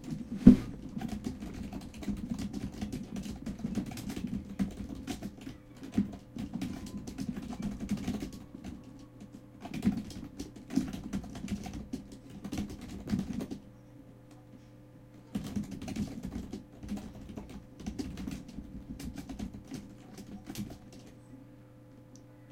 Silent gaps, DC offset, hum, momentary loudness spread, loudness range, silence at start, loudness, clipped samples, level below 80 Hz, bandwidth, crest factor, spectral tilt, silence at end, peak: none; under 0.1%; none; 18 LU; 5 LU; 0 s; -36 LUFS; under 0.1%; -50 dBFS; 16.5 kHz; 34 dB; -7 dB/octave; 0 s; -2 dBFS